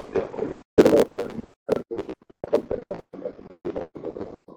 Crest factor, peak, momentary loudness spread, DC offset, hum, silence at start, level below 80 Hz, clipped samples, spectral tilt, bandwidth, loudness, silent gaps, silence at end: 24 dB; -2 dBFS; 19 LU; under 0.1%; none; 0 s; -52 dBFS; under 0.1%; -6.5 dB/octave; 19 kHz; -25 LUFS; 0.65-0.77 s, 1.56-1.66 s; 0.05 s